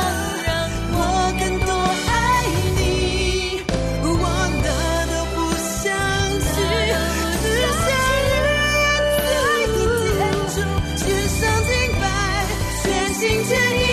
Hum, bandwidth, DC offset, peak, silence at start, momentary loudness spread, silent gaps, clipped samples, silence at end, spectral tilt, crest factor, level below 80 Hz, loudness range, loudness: none; 14 kHz; under 0.1%; -8 dBFS; 0 s; 5 LU; none; under 0.1%; 0 s; -4 dB/octave; 12 dB; -28 dBFS; 3 LU; -19 LUFS